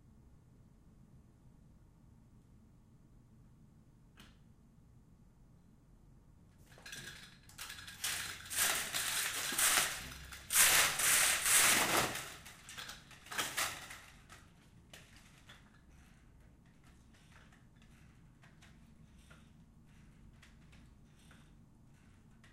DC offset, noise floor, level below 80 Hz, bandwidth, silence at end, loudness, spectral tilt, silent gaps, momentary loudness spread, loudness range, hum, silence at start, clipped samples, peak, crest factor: under 0.1%; -63 dBFS; -64 dBFS; 15.5 kHz; 1.65 s; -31 LUFS; 0 dB/octave; none; 26 LU; 23 LU; none; 1.15 s; under 0.1%; -12 dBFS; 28 dB